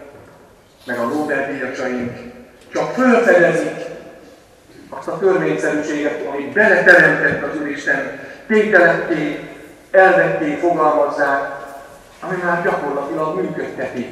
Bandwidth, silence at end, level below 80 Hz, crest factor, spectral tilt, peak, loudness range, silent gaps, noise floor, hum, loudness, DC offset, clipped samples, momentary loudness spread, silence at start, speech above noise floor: 13.5 kHz; 0 s; -56 dBFS; 18 dB; -5.5 dB/octave; 0 dBFS; 6 LU; none; -46 dBFS; none; -16 LUFS; under 0.1%; under 0.1%; 18 LU; 0 s; 30 dB